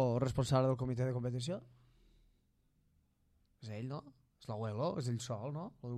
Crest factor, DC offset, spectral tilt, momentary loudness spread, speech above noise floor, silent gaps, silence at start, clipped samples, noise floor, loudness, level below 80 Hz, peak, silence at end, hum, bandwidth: 20 dB; under 0.1%; -7 dB/octave; 15 LU; 37 dB; none; 0 s; under 0.1%; -75 dBFS; -38 LUFS; -62 dBFS; -20 dBFS; 0 s; none; 11.5 kHz